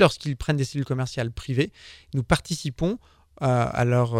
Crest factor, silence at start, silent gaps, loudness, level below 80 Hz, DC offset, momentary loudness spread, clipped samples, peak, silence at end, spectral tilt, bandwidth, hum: 22 dB; 0 s; none; -26 LUFS; -44 dBFS; under 0.1%; 8 LU; under 0.1%; -4 dBFS; 0 s; -6 dB/octave; 13.5 kHz; none